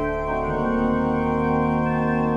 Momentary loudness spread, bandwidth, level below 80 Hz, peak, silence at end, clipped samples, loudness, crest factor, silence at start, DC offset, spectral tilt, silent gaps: 3 LU; 7.4 kHz; -36 dBFS; -10 dBFS; 0 s; under 0.1%; -22 LUFS; 12 dB; 0 s; under 0.1%; -9 dB/octave; none